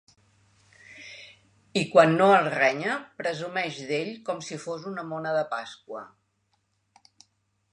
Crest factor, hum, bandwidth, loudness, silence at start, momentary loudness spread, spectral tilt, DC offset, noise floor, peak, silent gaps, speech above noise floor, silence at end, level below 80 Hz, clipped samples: 24 dB; none; 11 kHz; -25 LUFS; 0.9 s; 22 LU; -5 dB/octave; under 0.1%; -73 dBFS; -4 dBFS; none; 48 dB; 1.65 s; -76 dBFS; under 0.1%